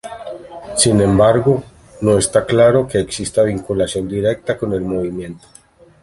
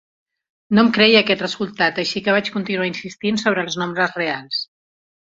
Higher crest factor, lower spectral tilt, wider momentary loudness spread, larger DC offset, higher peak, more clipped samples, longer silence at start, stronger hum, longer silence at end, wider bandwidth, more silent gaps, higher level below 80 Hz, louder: about the same, 16 dB vs 20 dB; about the same, -5 dB/octave vs -4.5 dB/octave; first, 16 LU vs 12 LU; neither; about the same, 0 dBFS vs 0 dBFS; neither; second, 0.05 s vs 0.7 s; neither; about the same, 0.65 s vs 0.75 s; first, 11.5 kHz vs 7.8 kHz; neither; first, -40 dBFS vs -60 dBFS; about the same, -16 LUFS vs -18 LUFS